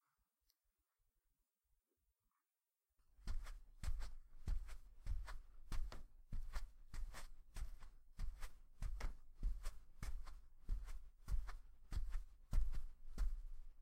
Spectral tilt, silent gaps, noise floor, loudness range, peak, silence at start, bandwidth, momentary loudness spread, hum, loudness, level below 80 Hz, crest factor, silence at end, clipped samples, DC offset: -5 dB/octave; none; under -90 dBFS; 6 LU; -28 dBFS; 3.2 s; 14 kHz; 11 LU; none; -54 LUFS; -48 dBFS; 18 dB; 0 s; under 0.1%; under 0.1%